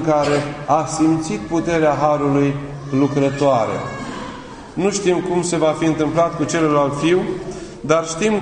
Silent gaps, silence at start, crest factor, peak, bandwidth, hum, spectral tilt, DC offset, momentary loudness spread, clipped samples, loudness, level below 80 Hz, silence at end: none; 0 s; 18 dB; 0 dBFS; 10.5 kHz; none; -5.5 dB/octave; under 0.1%; 12 LU; under 0.1%; -18 LUFS; -46 dBFS; 0 s